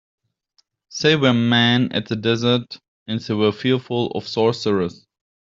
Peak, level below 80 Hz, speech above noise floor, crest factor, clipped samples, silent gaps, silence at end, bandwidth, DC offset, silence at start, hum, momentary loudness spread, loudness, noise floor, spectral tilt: -2 dBFS; -60 dBFS; 46 dB; 18 dB; under 0.1%; 2.88-3.06 s; 0.5 s; 7.6 kHz; under 0.1%; 0.9 s; none; 13 LU; -19 LUFS; -65 dBFS; -5.5 dB/octave